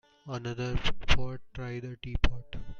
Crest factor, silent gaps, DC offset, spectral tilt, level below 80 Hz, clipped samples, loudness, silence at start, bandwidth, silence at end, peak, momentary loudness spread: 20 dB; none; under 0.1%; -5 dB/octave; -36 dBFS; under 0.1%; -34 LUFS; 0.25 s; 7 kHz; 0 s; -8 dBFS; 10 LU